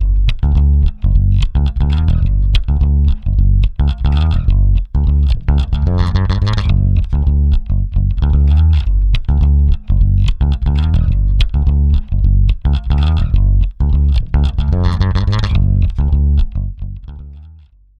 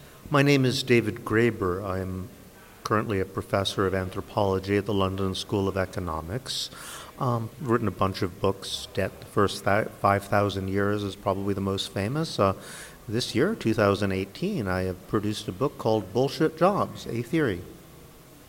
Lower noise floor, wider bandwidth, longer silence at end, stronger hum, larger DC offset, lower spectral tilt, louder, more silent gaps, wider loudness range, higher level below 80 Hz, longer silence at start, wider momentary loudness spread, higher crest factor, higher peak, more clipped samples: second, -42 dBFS vs -49 dBFS; second, 5.6 kHz vs 17.5 kHz; first, 0.5 s vs 0.05 s; neither; neither; first, -8 dB/octave vs -5.5 dB/octave; first, -15 LUFS vs -27 LUFS; neither; about the same, 1 LU vs 3 LU; first, -12 dBFS vs -54 dBFS; about the same, 0 s vs 0 s; second, 3 LU vs 9 LU; second, 10 dB vs 20 dB; first, 0 dBFS vs -6 dBFS; neither